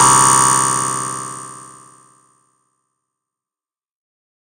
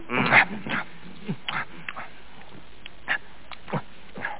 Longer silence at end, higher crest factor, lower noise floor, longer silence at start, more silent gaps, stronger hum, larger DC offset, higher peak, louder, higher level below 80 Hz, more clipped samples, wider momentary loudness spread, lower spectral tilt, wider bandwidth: first, 2.9 s vs 0 s; second, 18 dB vs 24 dB; first, under -90 dBFS vs -48 dBFS; about the same, 0 s vs 0 s; neither; neither; second, under 0.1% vs 2%; first, 0 dBFS vs -4 dBFS; first, -13 LUFS vs -25 LUFS; about the same, -54 dBFS vs -58 dBFS; neither; second, 23 LU vs 26 LU; about the same, -1.5 dB/octave vs -2.5 dB/octave; first, 17 kHz vs 4 kHz